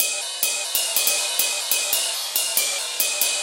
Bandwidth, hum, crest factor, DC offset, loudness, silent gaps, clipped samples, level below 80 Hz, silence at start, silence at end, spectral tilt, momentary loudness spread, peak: 17.5 kHz; none; 22 dB; under 0.1%; -20 LUFS; none; under 0.1%; -80 dBFS; 0 s; 0 s; 4 dB/octave; 3 LU; 0 dBFS